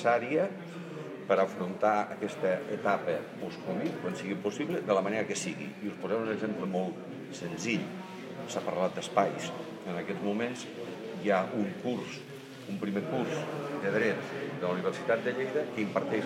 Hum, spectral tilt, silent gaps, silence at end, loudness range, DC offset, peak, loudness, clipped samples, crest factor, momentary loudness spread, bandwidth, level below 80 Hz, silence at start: none; -5.5 dB/octave; none; 0 s; 3 LU; under 0.1%; -10 dBFS; -33 LUFS; under 0.1%; 22 dB; 12 LU; 16 kHz; -80 dBFS; 0 s